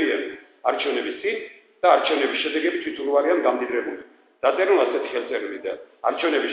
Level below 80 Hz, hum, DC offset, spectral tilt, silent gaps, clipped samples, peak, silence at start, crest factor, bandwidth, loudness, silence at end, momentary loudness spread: -74 dBFS; none; under 0.1%; -7 dB/octave; none; under 0.1%; -4 dBFS; 0 s; 20 dB; 5.2 kHz; -23 LUFS; 0 s; 13 LU